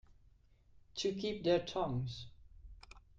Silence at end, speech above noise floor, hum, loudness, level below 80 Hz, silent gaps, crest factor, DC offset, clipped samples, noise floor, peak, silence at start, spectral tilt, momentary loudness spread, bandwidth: 0.2 s; 30 dB; none; -37 LUFS; -60 dBFS; none; 20 dB; under 0.1%; under 0.1%; -66 dBFS; -20 dBFS; 0.1 s; -5.5 dB/octave; 22 LU; 9 kHz